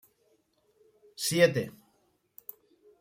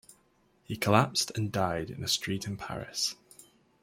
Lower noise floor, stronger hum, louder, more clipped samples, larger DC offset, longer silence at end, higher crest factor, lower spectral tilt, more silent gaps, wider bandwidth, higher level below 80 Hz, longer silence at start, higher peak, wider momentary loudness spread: about the same, -71 dBFS vs -68 dBFS; neither; first, -27 LUFS vs -30 LUFS; neither; neither; first, 1.3 s vs 0.4 s; about the same, 26 dB vs 26 dB; about the same, -4 dB/octave vs -4 dB/octave; neither; about the same, 16 kHz vs 16.5 kHz; second, -72 dBFS vs -62 dBFS; first, 1.2 s vs 0.1 s; about the same, -8 dBFS vs -6 dBFS; first, 23 LU vs 12 LU